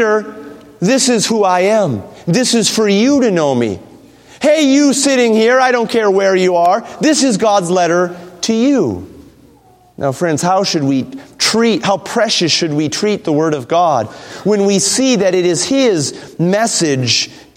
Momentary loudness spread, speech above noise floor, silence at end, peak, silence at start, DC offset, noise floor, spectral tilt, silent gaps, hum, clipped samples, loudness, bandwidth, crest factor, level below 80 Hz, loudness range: 8 LU; 34 dB; 0.15 s; 0 dBFS; 0 s; under 0.1%; -46 dBFS; -4 dB/octave; none; none; under 0.1%; -13 LUFS; 16 kHz; 14 dB; -56 dBFS; 4 LU